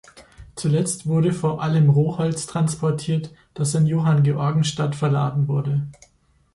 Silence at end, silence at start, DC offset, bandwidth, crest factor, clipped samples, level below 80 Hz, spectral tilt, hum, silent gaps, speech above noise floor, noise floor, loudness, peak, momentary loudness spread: 0.65 s; 0.15 s; under 0.1%; 11.5 kHz; 12 dB; under 0.1%; -54 dBFS; -6.5 dB/octave; none; none; 41 dB; -61 dBFS; -21 LUFS; -8 dBFS; 8 LU